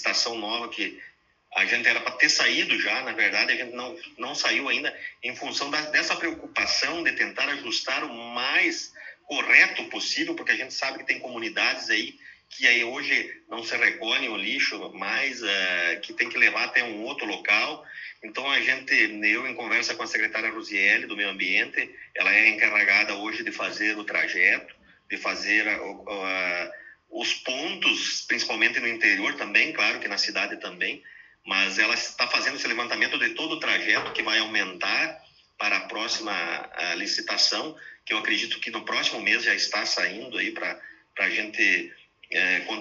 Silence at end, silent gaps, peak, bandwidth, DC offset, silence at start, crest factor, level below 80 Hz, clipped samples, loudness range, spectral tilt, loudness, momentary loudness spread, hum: 0 s; none; -2 dBFS; 8 kHz; under 0.1%; 0 s; 24 dB; -72 dBFS; under 0.1%; 4 LU; -1 dB/octave; -24 LUFS; 11 LU; none